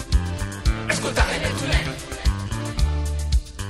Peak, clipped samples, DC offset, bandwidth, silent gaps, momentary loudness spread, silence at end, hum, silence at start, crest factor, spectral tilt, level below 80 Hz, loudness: -4 dBFS; under 0.1%; under 0.1%; 14 kHz; none; 6 LU; 0 s; none; 0 s; 18 dB; -4.5 dB/octave; -24 dBFS; -24 LUFS